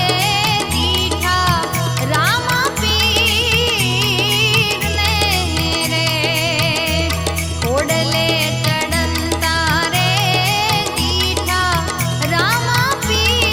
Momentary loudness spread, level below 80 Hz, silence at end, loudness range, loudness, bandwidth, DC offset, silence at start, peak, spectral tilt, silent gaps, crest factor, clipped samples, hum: 4 LU; -34 dBFS; 0 s; 2 LU; -15 LUFS; 17.5 kHz; under 0.1%; 0 s; 0 dBFS; -3.5 dB/octave; none; 16 dB; under 0.1%; none